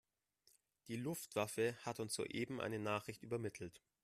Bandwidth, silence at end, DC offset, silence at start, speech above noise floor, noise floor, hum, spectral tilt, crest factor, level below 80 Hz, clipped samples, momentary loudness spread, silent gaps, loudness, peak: 15 kHz; 0.25 s; under 0.1%; 0.85 s; 34 dB; -78 dBFS; none; -4.5 dB/octave; 20 dB; -78 dBFS; under 0.1%; 8 LU; none; -44 LUFS; -26 dBFS